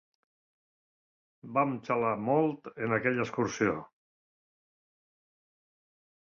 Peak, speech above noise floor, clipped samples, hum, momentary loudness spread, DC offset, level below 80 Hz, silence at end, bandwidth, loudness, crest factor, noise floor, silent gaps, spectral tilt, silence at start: -12 dBFS; over 60 dB; under 0.1%; none; 5 LU; under 0.1%; -70 dBFS; 2.55 s; 7.4 kHz; -30 LUFS; 22 dB; under -90 dBFS; none; -6.5 dB/octave; 1.45 s